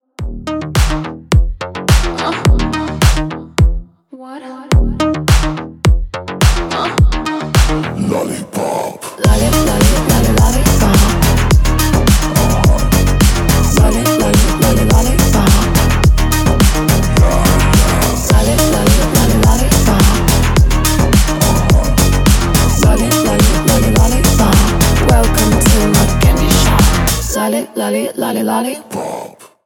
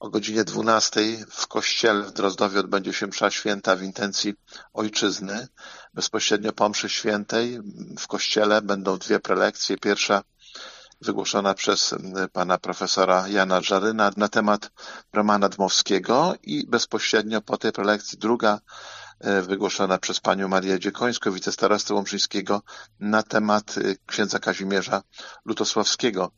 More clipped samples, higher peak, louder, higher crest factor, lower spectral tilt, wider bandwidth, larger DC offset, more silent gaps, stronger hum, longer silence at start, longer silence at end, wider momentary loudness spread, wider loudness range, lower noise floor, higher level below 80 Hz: neither; about the same, 0 dBFS vs -2 dBFS; first, -12 LUFS vs -23 LUFS; second, 10 dB vs 20 dB; first, -5 dB/octave vs -3 dB/octave; first, over 20 kHz vs 7.6 kHz; neither; neither; neither; first, 0.2 s vs 0 s; first, 0.4 s vs 0.1 s; second, 8 LU vs 11 LU; about the same, 5 LU vs 3 LU; second, -35 dBFS vs -43 dBFS; first, -14 dBFS vs -68 dBFS